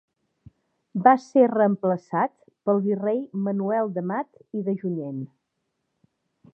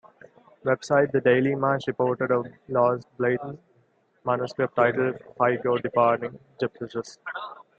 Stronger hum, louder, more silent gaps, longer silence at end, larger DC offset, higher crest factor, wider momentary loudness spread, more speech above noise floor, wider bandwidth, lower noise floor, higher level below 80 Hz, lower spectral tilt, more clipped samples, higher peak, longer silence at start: neither; about the same, -24 LUFS vs -25 LUFS; neither; first, 1.3 s vs 0.25 s; neither; about the same, 22 dB vs 20 dB; about the same, 13 LU vs 13 LU; first, 55 dB vs 40 dB; second, 7.6 kHz vs 8.6 kHz; first, -78 dBFS vs -65 dBFS; second, -74 dBFS vs -68 dBFS; first, -9 dB/octave vs -7 dB/octave; neither; first, -2 dBFS vs -6 dBFS; first, 0.95 s vs 0.65 s